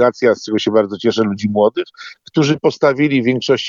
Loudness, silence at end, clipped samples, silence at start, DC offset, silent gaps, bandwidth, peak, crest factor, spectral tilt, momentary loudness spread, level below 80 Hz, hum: -16 LUFS; 0 s; under 0.1%; 0 s; under 0.1%; none; 7.6 kHz; -2 dBFS; 14 dB; -6 dB/octave; 7 LU; -60 dBFS; none